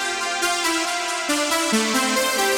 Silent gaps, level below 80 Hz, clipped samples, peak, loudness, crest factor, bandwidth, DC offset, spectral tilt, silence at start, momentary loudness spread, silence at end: none; -58 dBFS; under 0.1%; -8 dBFS; -20 LUFS; 14 dB; over 20 kHz; under 0.1%; -1 dB/octave; 0 s; 3 LU; 0 s